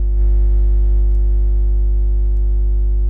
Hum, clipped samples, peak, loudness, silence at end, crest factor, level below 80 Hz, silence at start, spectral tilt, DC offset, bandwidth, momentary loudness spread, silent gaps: 50 Hz at -15 dBFS; under 0.1%; -8 dBFS; -18 LUFS; 0 s; 6 dB; -14 dBFS; 0 s; -12 dB/octave; under 0.1%; 0.9 kHz; 2 LU; none